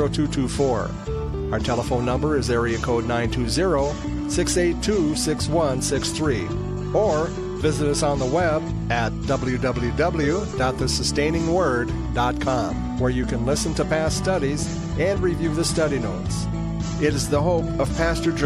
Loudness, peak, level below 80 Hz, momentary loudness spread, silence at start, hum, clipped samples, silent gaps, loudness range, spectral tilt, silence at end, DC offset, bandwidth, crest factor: -23 LUFS; -8 dBFS; -32 dBFS; 5 LU; 0 s; none; under 0.1%; none; 1 LU; -5 dB/octave; 0 s; under 0.1%; 15 kHz; 14 dB